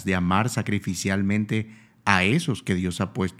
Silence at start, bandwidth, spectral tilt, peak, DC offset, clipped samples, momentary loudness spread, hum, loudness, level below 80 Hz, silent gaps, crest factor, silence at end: 0 s; 14.5 kHz; -5.5 dB/octave; 0 dBFS; under 0.1%; under 0.1%; 8 LU; none; -24 LUFS; -54 dBFS; none; 24 dB; 0.05 s